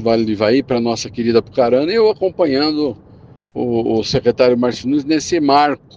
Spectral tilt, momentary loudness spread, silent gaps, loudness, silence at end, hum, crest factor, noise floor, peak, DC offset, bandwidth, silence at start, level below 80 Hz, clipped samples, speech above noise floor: -5.5 dB/octave; 7 LU; none; -16 LUFS; 0.2 s; none; 16 dB; -43 dBFS; 0 dBFS; under 0.1%; 9.2 kHz; 0 s; -48 dBFS; under 0.1%; 28 dB